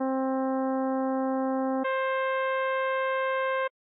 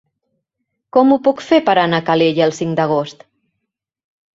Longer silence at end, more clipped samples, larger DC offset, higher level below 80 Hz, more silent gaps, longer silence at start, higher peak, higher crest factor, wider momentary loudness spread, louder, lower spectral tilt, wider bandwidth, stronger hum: second, 0.3 s vs 1.25 s; neither; neither; second, under -90 dBFS vs -60 dBFS; neither; second, 0 s vs 0.95 s; second, -22 dBFS vs -2 dBFS; second, 6 dB vs 16 dB; second, 1 LU vs 6 LU; second, -28 LUFS vs -15 LUFS; second, -0.5 dB/octave vs -6 dB/octave; second, 3.9 kHz vs 7.8 kHz; neither